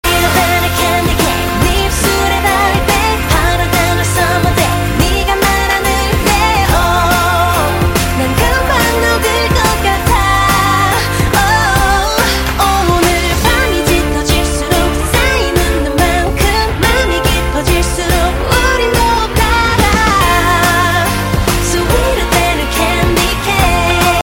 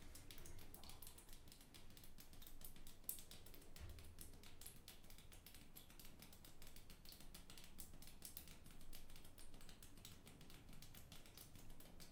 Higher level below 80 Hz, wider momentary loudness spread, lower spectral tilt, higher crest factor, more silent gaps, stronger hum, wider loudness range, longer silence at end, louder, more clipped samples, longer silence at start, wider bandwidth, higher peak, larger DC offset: first, -18 dBFS vs -62 dBFS; second, 3 LU vs 7 LU; about the same, -4 dB/octave vs -3 dB/octave; second, 12 dB vs 32 dB; neither; neither; second, 1 LU vs 4 LU; about the same, 0 s vs 0 s; first, -11 LUFS vs -61 LUFS; neither; about the same, 0.05 s vs 0 s; about the same, 17 kHz vs 18 kHz; first, 0 dBFS vs -26 dBFS; neither